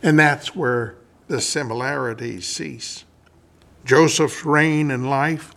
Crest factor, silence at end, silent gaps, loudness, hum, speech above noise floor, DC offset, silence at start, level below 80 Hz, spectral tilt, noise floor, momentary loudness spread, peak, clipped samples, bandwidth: 20 dB; 0.1 s; none; -20 LUFS; none; 34 dB; under 0.1%; 0.05 s; -60 dBFS; -4.5 dB/octave; -54 dBFS; 15 LU; 0 dBFS; under 0.1%; 14.5 kHz